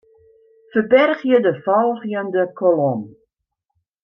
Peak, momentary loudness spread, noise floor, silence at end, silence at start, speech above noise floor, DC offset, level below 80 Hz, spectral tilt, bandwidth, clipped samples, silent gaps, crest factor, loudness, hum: -2 dBFS; 9 LU; -78 dBFS; 0.95 s; 0.75 s; 61 dB; under 0.1%; -68 dBFS; -8.5 dB/octave; 5.6 kHz; under 0.1%; none; 18 dB; -18 LUFS; none